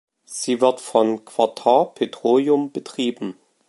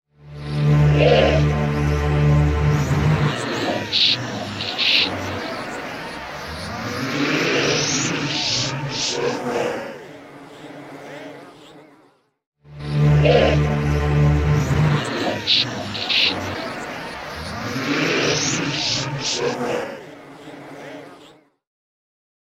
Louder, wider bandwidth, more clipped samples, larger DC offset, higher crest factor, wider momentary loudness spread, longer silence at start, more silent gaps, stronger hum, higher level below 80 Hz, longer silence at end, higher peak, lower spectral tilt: about the same, -20 LUFS vs -20 LUFS; second, 11.5 kHz vs 13 kHz; neither; neither; about the same, 20 dB vs 18 dB; second, 11 LU vs 21 LU; about the same, 0.3 s vs 0.25 s; second, none vs 12.46-12.52 s; neither; second, -76 dBFS vs -32 dBFS; second, 0.35 s vs 1.2 s; about the same, -2 dBFS vs -2 dBFS; about the same, -4.5 dB/octave vs -4.5 dB/octave